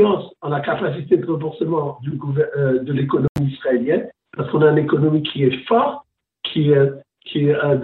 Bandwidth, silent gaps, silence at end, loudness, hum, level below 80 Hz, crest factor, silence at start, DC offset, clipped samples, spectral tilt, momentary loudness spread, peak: 4.2 kHz; 3.29-3.35 s; 0 s; -19 LUFS; none; -54 dBFS; 16 dB; 0 s; under 0.1%; under 0.1%; -9.5 dB/octave; 10 LU; -4 dBFS